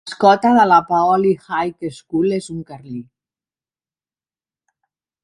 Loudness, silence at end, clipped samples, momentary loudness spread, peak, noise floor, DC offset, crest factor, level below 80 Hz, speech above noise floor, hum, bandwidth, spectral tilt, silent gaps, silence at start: -16 LUFS; 2.2 s; under 0.1%; 20 LU; 0 dBFS; under -90 dBFS; under 0.1%; 18 dB; -60 dBFS; over 74 dB; none; 11.5 kHz; -6 dB/octave; none; 0.05 s